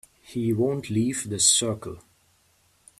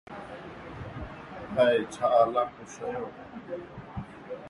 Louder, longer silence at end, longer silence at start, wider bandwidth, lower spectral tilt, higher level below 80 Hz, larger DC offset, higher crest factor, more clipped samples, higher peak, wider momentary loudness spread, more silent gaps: first, -23 LUFS vs -28 LUFS; first, 1 s vs 0 s; first, 0.3 s vs 0.1 s; first, 14.5 kHz vs 11.5 kHz; second, -3.5 dB/octave vs -5.5 dB/octave; second, -60 dBFS vs -54 dBFS; neither; about the same, 22 dB vs 20 dB; neither; first, -4 dBFS vs -10 dBFS; second, 16 LU vs 19 LU; neither